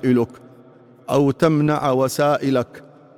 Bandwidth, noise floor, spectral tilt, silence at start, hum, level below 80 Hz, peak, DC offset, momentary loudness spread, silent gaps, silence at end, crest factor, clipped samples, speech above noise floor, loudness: 17 kHz; -47 dBFS; -6.5 dB/octave; 0 s; none; -58 dBFS; -4 dBFS; under 0.1%; 10 LU; none; 0.35 s; 16 dB; under 0.1%; 29 dB; -19 LUFS